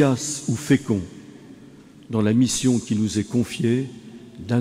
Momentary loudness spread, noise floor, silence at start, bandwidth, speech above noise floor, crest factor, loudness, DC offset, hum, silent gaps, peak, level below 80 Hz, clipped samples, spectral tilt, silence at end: 19 LU; -46 dBFS; 0 s; 15.5 kHz; 25 dB; 16 dB; -22 LUFS; under 0.1%; none; none; -6 dBFS; -56 dBFS; under 0.1%; -5.5 dB/octave; 0 s